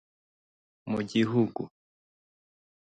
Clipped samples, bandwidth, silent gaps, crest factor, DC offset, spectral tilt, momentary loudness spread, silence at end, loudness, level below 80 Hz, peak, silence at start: under 0.1%; 9 kHz; none; 20 dB; under 0.1%; -7 dB/octave; 16 LU; 1.25 s; -29 LUFS; -68 dBFS; -14 dBFS; 0.85 s